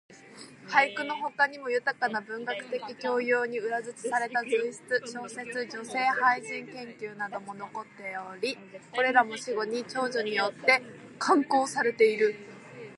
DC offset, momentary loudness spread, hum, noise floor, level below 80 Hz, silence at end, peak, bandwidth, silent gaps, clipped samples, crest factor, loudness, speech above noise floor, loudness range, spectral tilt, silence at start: under 0.1%; 15 LU; none; -49 dBFS; -82 dBFS; 0 s; -8 dBFS; 11.5 kHz; none; under 0.1%; 22 dB; -28 LUFS; 21 dB; 5 LU; -3 dB/octave; 0.1 s